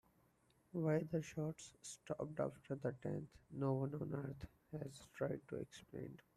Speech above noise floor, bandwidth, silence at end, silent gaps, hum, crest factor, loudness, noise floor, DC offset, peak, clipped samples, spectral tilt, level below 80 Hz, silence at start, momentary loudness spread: 31 dB; 13.5 kHz; 0.2 s; none; none; 18 dB; -45 LUFS; -76 dBFS; under 0.1%; -26 dBFS; under 0.1%; -7 dB/octave; -72 dBFS; 0.75 s; 13 LU